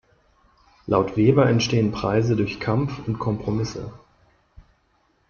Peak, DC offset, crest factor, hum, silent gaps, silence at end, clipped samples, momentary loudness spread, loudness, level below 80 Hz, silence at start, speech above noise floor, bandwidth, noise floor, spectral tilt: -4 dBFS; under 0.1%; 18 dB; none; none; 1.3 s; under 0.1%; 11 LU; -22 LUFS; -48 dBFS; 0.85 s; 44 dB; 7 kHz; -65 dBFS; -7 dB/octave